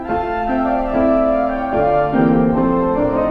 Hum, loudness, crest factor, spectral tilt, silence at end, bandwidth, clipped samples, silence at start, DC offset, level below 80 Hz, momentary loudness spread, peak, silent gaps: none; -16 LUFS; 14 dB; -10 dB/octave; 0 s; 5.2 kHz; under 0.1%; 0 s; under 0.1%; -32 dBFS; 4 LU; -2 dBFS; none